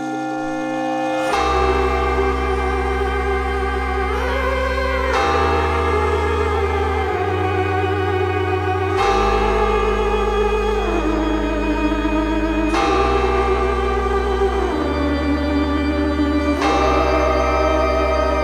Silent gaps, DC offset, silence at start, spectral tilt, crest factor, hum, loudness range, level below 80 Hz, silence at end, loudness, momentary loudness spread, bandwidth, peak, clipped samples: none; under 0.1%; 0 s; -6 dB/octave; 14 dB; none; 1 LU; -26 dBFS; 0 s; -19 LUFS; 4 LU; 13.5 kHz; -4 dBFS; under 0.1%